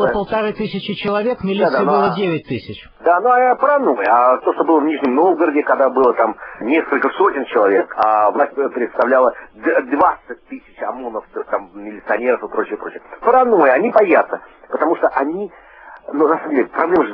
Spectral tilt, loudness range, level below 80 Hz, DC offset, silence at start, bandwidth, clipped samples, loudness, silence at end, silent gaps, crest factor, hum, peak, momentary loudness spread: -9 dB/octave; 5 LU; -54 dBFS; under 0.1%; 0 s; 5.6 kHz; under 0.1%; -16 LUFS; 0 s; none; 16 dB; none; 0 dBFS; 14 LU